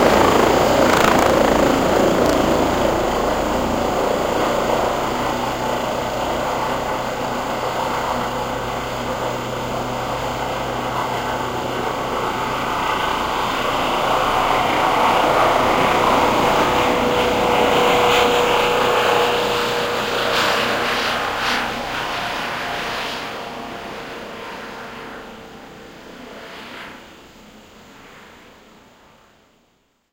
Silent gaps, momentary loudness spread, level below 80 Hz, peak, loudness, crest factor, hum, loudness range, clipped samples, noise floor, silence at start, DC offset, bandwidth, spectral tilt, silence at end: none; 17 LU; -40 dBFS; 0 dBFS; -18 LUFS; 20 dB; none; 17 LU; under 0.1%; -62 dBFS; 0 s; under 0.1%; 16 kHz; -4 dB/octave; 1.8 s